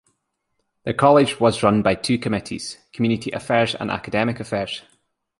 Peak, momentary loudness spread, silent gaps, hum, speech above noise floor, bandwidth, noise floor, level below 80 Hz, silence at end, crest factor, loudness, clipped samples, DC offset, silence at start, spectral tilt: -2 dBFS; 15 LU; none; none; 54 dB; 11.5 kHz; -74 dBFS; -52 dBFS; 0.6 s; 20 dB; -20 LUFS; under 0.1%; under 0.1%; 0.85 s; -5.5 dB/octave